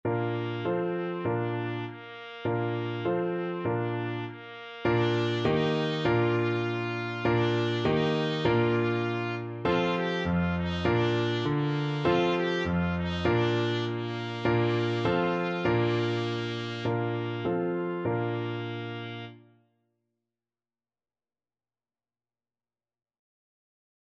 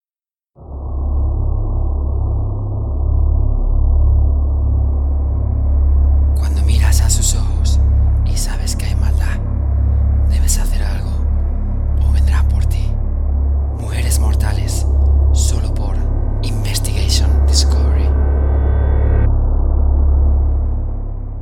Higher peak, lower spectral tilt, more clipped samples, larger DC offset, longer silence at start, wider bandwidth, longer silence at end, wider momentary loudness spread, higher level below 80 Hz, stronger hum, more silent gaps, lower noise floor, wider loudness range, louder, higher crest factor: second, -12 dBFS vs 0 dBFS; first, -7.5 dB/octave vs -5 dB/octave; neither; neither; second, 0.05 s vs 0.6 s; second, 7.6 kHz vs 13.5 kHz; first, 4.75 s vs 0 s; about the same, 8 LU vs 6 LU; second, -54 dBFS vs -14 dBFS; neither; neither; about the same, under -90 dBFS vs under -90 dBFS; first, 6 LU vs 3 LU; second, -29 LUFS vs -17 LUFS; about the same, 18 dB vs 14 dB